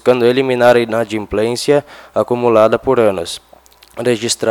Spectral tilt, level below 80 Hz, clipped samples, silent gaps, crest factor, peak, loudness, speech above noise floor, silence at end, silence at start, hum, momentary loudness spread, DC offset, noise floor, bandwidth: -4.5 dB/octave; -48 dBFS; 0.1%; none; 14 dB; 0 dBFS; -14 LUFS; 32 dB; 0 s; 0.05 s; none; 12 LU; under 0.1%; -45 dBFS; 19 kHz